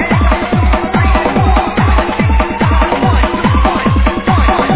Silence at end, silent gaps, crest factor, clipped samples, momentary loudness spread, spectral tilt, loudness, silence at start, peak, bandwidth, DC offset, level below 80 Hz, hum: 0 s; none; 10 dB; under 0.1%; 1 LU; -10.5 dB/octave; -12 LUFS; 0 s; 0 dBFS; 4 kHz; 0.2%; -14 dBFS; none